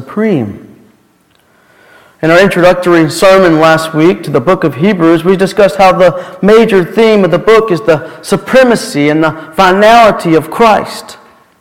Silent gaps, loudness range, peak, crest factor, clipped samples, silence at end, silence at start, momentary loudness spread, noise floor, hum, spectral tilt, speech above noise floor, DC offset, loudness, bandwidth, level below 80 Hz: none; 1 LU; 0 dBFS; 8 dB; 2%; 0.45 s; 0 s; 7 LU; -50 dBFS; none; -5.5 dB/octave; 42 dB; under 0.1%; -8 LUFS; 17 kHz; -40 dBFS